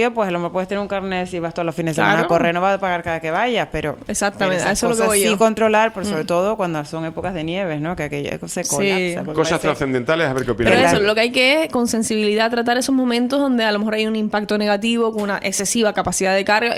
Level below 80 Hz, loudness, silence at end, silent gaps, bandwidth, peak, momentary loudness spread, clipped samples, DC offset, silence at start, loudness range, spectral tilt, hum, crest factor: -46 dBFS; -18 LUFS; 0 s; none; 16 kHz; 0 dBFS; 9 LU; under 0.1%; under 0.1%; 0 s; 5 LU; -4 dB/octave; none; 18 dB